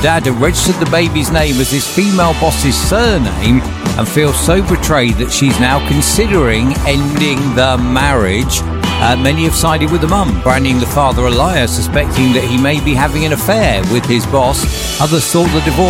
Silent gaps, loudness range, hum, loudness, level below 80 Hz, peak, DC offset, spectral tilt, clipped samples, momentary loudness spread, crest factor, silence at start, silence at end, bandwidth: none; 1 LU; none; -12 LUFS; -20 dBFS; 0 dBFS; under 0.1%; -4.5 dB/octave; under 0.1%; 2 LU; 12 dB; 0 s; 0 s; 16.5 kHz